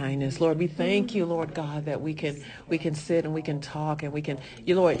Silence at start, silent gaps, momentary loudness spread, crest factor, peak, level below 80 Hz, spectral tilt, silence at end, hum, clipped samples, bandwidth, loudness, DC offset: 0 s; none; 8 LU; 18 dB; -8 dBFS; -58 dBFS; -6.5 dB/octave; 0 s; none; under 0.1%; 9.8 kHz; -28 LUFS; under 0.1%